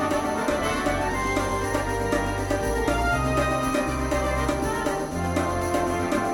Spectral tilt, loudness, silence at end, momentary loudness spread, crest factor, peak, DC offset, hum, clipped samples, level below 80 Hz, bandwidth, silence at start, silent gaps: -5 dB/octave; -25 LUFS; 0 s; 3 LU; 16 dB; -8 dBFS; under 0.1%; none; under 0.1%; -34 dBFS; 17 kHz; 0 s; none